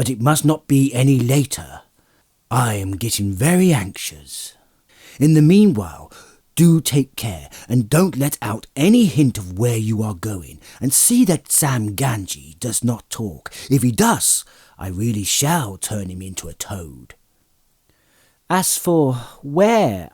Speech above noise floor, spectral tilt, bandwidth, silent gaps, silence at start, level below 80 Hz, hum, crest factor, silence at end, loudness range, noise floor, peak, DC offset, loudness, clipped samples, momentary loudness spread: 44 dB; -5 dB/octave; over 20 kHz; none; 0 s; -50 dBFS; none; 16 dB; 0.1 s; 6 LU; -61 dBFS; -2 dBFS; under 0.1%; -17 LUFS; under 0.1%; 15 LU